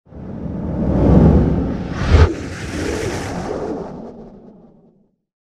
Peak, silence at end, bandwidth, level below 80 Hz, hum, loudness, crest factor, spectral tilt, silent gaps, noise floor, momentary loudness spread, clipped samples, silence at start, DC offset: 0 dBFS; 0.9 s; 11 kHz; -24 dBFS; none; -18 LUFS; 18 dB; -7.5 dB/octave; none; -55 dBFS; 19 LU; under 0.1%; 0.1 s; under 0.1%